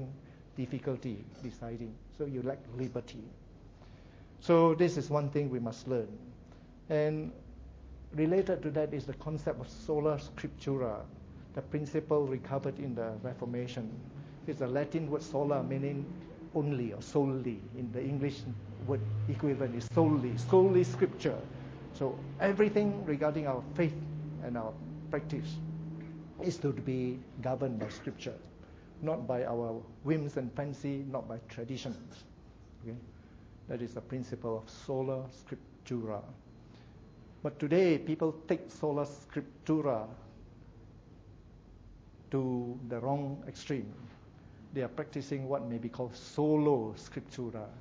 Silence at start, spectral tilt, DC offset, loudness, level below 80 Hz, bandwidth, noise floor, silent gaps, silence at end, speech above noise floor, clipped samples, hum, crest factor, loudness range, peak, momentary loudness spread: 0 s; -8 dB/octave; under 0.1%; -35 LUFS; -58 dBFS; 8 kHz; -55 dBFS; none; 0 s; 21 dB; under 0.1%; none; 22 dB; 10 LU; -14 dBFS; 19 LU